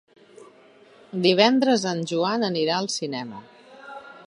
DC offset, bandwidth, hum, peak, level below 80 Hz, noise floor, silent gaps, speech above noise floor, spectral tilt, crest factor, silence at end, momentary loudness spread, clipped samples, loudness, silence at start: under 0.1%; 11 kHz; none; -2 dBFS; -76 dBFS; -52 dBFS; none; 30 dB; -4.5 dB/octave; 24 dB; 0.05 s; 23 LU; under 0.1%; -22 LUFS; 0.4 s